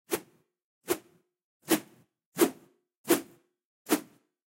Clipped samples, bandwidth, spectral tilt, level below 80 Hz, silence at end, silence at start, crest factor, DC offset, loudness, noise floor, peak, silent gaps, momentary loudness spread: under 0.1%; 16 kHz; -3 dB/octave; -76 dBFS; 0.5 s; 0.1 s; 24 dB; under 0.1%; -31 LUFS; -58 dBFS; -10 dBFS; 0.64-0.81 s, 1.44-1.60 s, 2.26-2.32 s, 2.98-3.04 s, 3.65-3.85 s; 19 LU